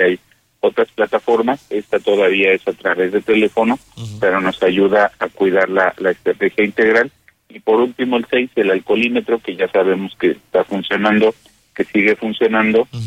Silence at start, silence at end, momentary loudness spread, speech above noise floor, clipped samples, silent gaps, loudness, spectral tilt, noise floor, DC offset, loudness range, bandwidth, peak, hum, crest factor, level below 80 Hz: 0 s; 0 s; 6 LU; 19 dB; under 0.1%; none; -16 LUFS; -6.5 dB/octave; -34 dBFS; under 0.1%; 2 LU; 10.5 kHz; -2 dBFS; none; 14 dB; -56 dBFS